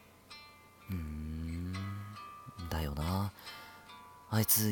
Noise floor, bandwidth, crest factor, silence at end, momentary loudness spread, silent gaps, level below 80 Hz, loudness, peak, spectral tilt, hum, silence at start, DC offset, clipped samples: -57 dBFS; 18 kHz; 24 dB; 0 s; 19 LU; none; -50 dBFS; -37 LUFS; -14 dBFS; -4.5 dB/octave; none; 0 s; under 0.1%; under 0.1%